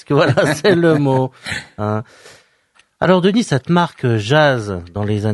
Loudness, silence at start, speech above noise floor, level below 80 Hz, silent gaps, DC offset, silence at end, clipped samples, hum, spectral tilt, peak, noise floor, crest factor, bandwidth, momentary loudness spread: -16 LUFS; 0.1 s; 41 dB; -50 dBFS; none; under 0.1%; 0 s; under 0.1%; none; -6.5 dB/octave; 0 dBFS; -56 dBFS; 16 dB; 11.5 kHz; 10 LU